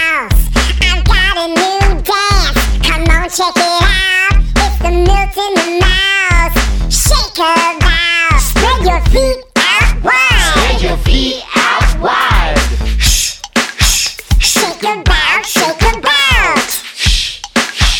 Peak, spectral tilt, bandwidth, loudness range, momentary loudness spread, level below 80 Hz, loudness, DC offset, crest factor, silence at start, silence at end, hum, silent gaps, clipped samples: 0 dBFS; -3 dB/octave; 19 kHz; 1 LU; 4 LU; -14 dBFS; -11 LUFS; under 0.1%; 10 dB; 0 s; 0 s; none; none; under 0.1%